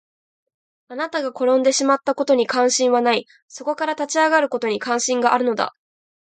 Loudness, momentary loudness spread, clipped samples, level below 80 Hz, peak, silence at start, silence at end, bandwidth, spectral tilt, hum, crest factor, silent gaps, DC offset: -19 LUFS; 9 LU; under 0.1%; -74 dBFS; -2 dBFS; 0.9 s; 0.65 s; 9.4 kHz; -2 dB/octave; none; 18 dB; 3.42-3.48 s; under 0.1%